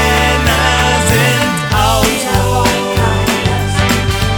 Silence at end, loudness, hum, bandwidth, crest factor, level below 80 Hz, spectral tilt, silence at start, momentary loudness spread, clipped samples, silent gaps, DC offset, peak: 0 s; -12 LUFS; none; over 20 kHz; 12 dB; -22 dBFS; -4 dB/octave; 0 s; 3 LU; under 0.1%; none; under 0.1%; 0 dBFS